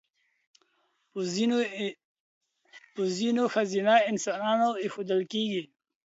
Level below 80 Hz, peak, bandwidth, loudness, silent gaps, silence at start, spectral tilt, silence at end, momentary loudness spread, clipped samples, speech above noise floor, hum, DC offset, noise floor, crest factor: -80 dBFS; -8 dBFS; 8 kHz; -28 LUFS; 2.05-2.41 s; 1.15 s; -4.5 dB/octave; 0.4 s; 12 LU; under 0.1%; 46 dB; none; under 0.1%; -73 dBFS; 20 dB